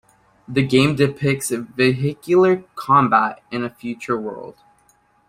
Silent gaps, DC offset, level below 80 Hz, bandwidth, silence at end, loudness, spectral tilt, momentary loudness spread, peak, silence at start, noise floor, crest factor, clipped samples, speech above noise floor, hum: none; under 0.1%; -54 dBFS; 15.5 kHz; 0.8 s; -19 LUFS; -6 dB/octave; 12 LU; -2 dBFS; 0.5 s; -59 dBFS; 18 dB; under 0.1%; 40 dB; none